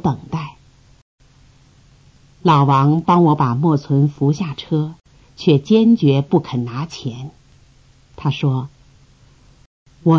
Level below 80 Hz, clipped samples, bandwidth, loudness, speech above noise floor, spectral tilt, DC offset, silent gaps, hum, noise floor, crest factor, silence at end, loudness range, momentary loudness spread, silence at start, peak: -52 dBFS; under 0.1%; 7.2 kHz; -17 LUFS; 35 dB; -8.5 dB/octave; under 0.1%; 1.02-1.18 s, 9.66-9.86 s; none; -50 dBFS; 16 dB; 0 s; 9 LU; 15 LU; 0.05 s; -2 dBFS